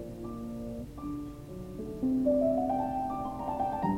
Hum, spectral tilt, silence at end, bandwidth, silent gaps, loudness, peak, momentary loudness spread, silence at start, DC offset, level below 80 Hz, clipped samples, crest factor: none; -8.5 dB/octave; 0 s; 16 kHz; none; -33 LUFS; -18 dBFS; 13 LU; 0 s; under 0.1%; -50 dBFS; under 0.1%; 16 dB